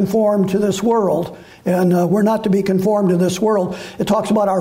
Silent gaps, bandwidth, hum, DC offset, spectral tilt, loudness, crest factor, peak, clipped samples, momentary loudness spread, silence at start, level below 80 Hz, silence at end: none; 16 kHz; none; under 0.1%; -7 dB/octave; -17 LUFS; 10 dB; -6 dBFS; under 0.1%; 6 LU; 0 s; -52 dBFS; 0 s